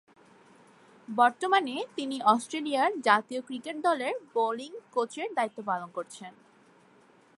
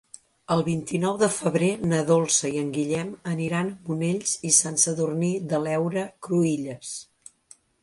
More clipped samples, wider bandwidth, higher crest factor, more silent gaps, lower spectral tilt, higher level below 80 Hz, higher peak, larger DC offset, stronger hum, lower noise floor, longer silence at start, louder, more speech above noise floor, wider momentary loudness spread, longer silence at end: neither; about the same, 11.5 kHz vs 11.5 kHz; about the same, 22 dB vs 20 dB; neither; about the same, -3.5 dB/octave vs -4.5 dB/octave; second, -86 dBFS vs -62 dBFS; about the same, -8 dBFS vs -6 dBFS; neither; neither; first, -60 dBFS vs -56 dBFS; first, 1.1 s vs 0.5 s; second, -29 LUFS vs -24 LUFS; about the same, 31 dB vs 31 dB; first, 13 LU vs 10 LU; first, 1.1 s vs 0.8 s